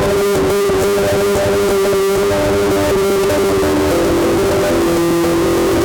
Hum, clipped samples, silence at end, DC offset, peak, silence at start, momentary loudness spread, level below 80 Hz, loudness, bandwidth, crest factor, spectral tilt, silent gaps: none; under 0.1%; 0 s; under 0.1%; -8 dBFS; 0 s; 0 LU; -32 dBFS; -14 LUFS; 19.5 kHz; 6 dB; -5 dB/octave; none